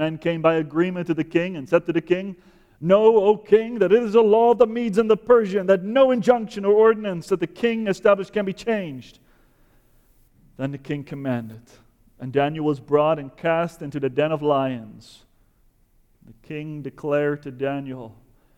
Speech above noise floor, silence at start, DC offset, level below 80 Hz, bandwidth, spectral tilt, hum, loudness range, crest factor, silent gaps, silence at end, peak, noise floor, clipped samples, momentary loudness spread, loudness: 39 dB; 0 s; under 0.1%; -58 dBFS; 10.5 kHz; -7 dB/octave; none; 12 LU; 18 dB; none; 0.45 s; -4 dBFS; -60 dBFS; under 0.1%; 14 LU; -21 LUFS